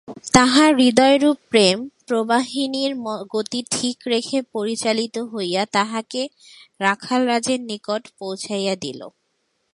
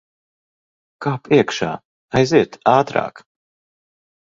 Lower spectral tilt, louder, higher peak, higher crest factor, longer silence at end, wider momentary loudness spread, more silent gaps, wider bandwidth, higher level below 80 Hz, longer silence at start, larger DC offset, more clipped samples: second, -3.5 dB/octave vs -6 dB/octave; about the same, -20 LUFS vs -18 LUFS; about the same, 0 dBFS vs 0 dBFS; about the same, 20 dB vs 20 dB; second, 0.65 s vs 1.05 s; about the same, 13 LU vs 11 LU; second, none vs 1.85-2.09 s; first, 11.5 kHz vs 7.6 kHz; about the same, -52 dBFS vs -54 dBFS; second, 0.1 s vs 1 s; neither; neither